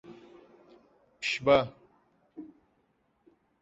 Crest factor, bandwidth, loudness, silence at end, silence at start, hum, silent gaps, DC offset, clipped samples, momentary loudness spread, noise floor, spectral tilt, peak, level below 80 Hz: 24 dB; 8 kHz; -28 LUFS; 1.15 s; 0.1 s; none; none; under 0.1%; under 0.1%; 28 LU; -72 dBFS; -3 dB/octave; -10 dBFS; -66 dBFS